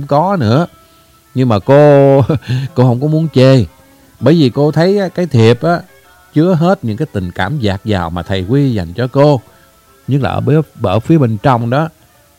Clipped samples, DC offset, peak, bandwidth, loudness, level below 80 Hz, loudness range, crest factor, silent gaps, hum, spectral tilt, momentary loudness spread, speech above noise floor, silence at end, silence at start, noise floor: 0.3%; under 0.1%; 0 dBFS; 15.5 kHz; -12 LUFS; -42 dBFS; 4 LU; 12 dB; none; none; -8 dB/octave; 9 LU; 35 dB; 0.5 s; 0 s; -46 dBFS